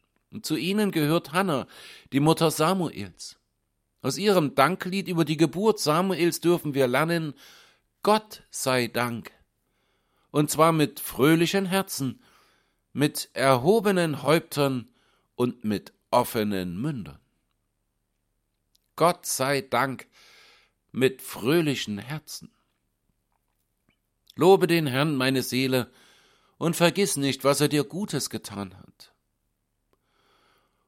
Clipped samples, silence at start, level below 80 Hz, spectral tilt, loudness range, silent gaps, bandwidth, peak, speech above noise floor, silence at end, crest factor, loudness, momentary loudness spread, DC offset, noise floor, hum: under 0.1%; 0.35 s; -64 dBFS; -5 dB/octave; 6 LU; none; 16.5 kHz; -4 dBFS; 52 dB; 2.15 s; 24 dB; -25 LUFS; 16 LU; under 0.1%; -76 dBFS; none